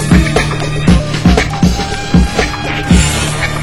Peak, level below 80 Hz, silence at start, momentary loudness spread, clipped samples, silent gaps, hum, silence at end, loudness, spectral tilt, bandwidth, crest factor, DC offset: 0 dBFS; -18 dBFS; 0 s; 5 LU; 1%; none; none; 0 s; -12 LUFS; -5 dB/octave; 16 kHz; 12 dB; under 0.1%